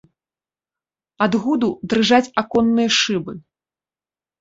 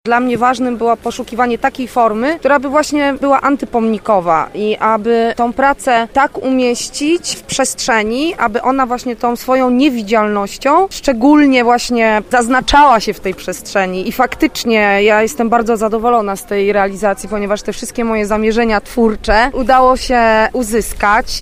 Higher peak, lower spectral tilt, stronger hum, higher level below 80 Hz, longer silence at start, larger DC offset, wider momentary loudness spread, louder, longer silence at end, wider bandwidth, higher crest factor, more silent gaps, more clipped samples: about the same, -2 dBFS vs 0 dBFS; about the same, -4 dB/octave vs -4 dB/octave; neither; second, -56 dBFS vs -34 dBFS; first, 1.2 s vs 0.05 s; neither; about the same, 9 LU vs 7 LU; second, -18 LUFS vs -13 LUFS; first, 1 s vs 0 s; second, 8 kHz vs 16 kHz; first, 18 dB vs 12 dB; neither; neither